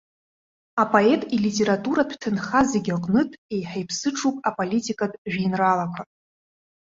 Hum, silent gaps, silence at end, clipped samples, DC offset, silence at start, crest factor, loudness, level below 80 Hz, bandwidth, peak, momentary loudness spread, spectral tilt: none; 3.38-3.49 s, 5.18-5.25 s; 0.8 s; under 0.1%; under 0.1%; 0.75 s; 20 dB; -23 LUFS; -60 dBFS; 7.8 kHz; -2 dBFS; 9 LU; -5 dB/octave